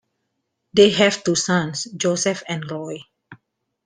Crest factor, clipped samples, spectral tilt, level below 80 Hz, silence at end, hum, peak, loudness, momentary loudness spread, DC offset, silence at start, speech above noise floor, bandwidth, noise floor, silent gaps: 20 dB; under 0.1%; -3.5 dB/octave; -60 dBFS; 0.5 s; none; -2 dBFS; -19 LUFS; 16 LU; under 0.1%; 0.75 s; 56 dB; 10 kHz; -75 dBFS; none